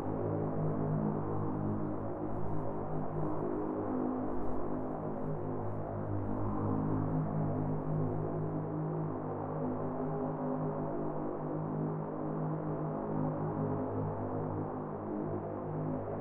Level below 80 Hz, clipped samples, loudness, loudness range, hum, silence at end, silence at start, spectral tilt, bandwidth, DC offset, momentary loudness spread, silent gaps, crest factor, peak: -54 dBFS; under 0.1%; -37 LUFS; 2 LU; none; 0 s; 0 s; -12.5 dB/octave; 2.9 kHz; under 0.1%; 4 LU; none; 14 dB; -22 dBFS